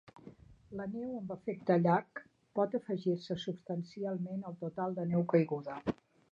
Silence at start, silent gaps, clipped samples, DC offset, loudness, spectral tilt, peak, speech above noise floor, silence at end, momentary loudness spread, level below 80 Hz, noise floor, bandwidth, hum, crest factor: 0.15 s; none; under 0.1%; under 0.1%; -36 LUFS; -8.5 dB/octave; -16 dBFS; 22 dB; 0.4 s; 12 LU; -70 dBFS; -56 dBFS; 7.2 kHz; none; 20 dB